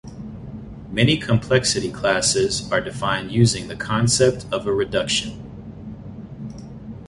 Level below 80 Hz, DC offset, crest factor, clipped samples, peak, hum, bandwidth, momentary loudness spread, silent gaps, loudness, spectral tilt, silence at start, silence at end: -44 dBFS; under 0.1%; 18 dB; under 0.1%; -4 dBFS; none; 11.5 kHz; 19 LU; none; -20 LUFS; -4 dB/octave; 0.05 s; 0 s